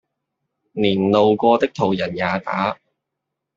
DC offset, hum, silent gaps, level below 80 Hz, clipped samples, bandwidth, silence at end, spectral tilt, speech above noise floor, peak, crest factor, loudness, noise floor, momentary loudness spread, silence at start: under 0.1%; none; none; -60 dBFS; under 0.1%; 7.4 kHz; 0.8 s; -7 dB/octave; 63 dB; -2 dBFS; 18 dB; -19 LUFS; -81 dBFS; 9 LU; 0.75 s